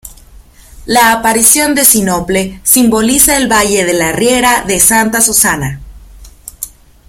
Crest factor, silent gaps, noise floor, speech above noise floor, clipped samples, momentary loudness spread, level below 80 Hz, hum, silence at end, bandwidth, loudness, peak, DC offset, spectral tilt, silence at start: 12 dB; none; -38 dBFS; 28 dB; 0.6%; 13 LU; -34 dBFS; none; 0.4 s; over 20 kHz; -8 LUFS; 0 dBFS; under 0.1%; -2.5 dB/octave; 0.05 s